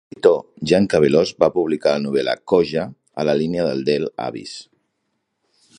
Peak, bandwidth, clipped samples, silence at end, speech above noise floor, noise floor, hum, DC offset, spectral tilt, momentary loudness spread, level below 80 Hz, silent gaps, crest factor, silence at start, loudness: 0 dBFS; 10.5 kHz; under 0.1%; 1.15 s; 55 dB; -73 dBFS; none; under 0.1%; -6 dB/octave; 13 LU; -54 dBFS; none; 18 dB; 0.25 s; -19 LUFS